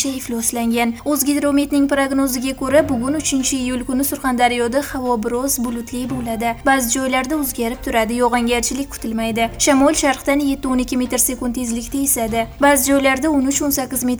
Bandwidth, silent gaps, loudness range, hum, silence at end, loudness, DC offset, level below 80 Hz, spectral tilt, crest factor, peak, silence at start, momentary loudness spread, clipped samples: over 20 kHz; none; 2 LU; none; 0 s; -18 LUFS; under 0.1%; -38 dBFS; -3 dB/octave; 14 dB; -4 dBFS; 0 s; 7 LU; under 0.1%